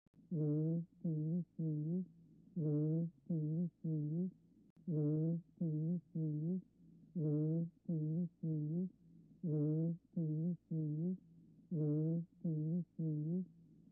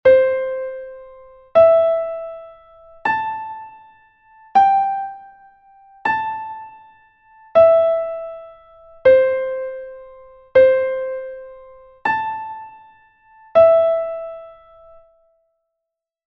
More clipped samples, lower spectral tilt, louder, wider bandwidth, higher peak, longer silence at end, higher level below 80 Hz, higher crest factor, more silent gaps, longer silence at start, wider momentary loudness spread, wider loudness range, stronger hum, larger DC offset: neither; first, -17 dB/octave vs -6 dB/octave; second, -41 LUFS vs -17 LUFS; second, 1.4 kHz vs 5.8 kHz; second, -30 dBFS vs -2 dBFS; second, 0.4 s vs 1.75 s; second, -82 dBFS vs -56 dBFS; second, 10 dB vs 16 dB; first, 4.70-4.76 s vs none; first, 0.3 s vs 0.05 s; second, 7 LU vs 23 LU; second, 1 LU vs 4 LU; neither; neither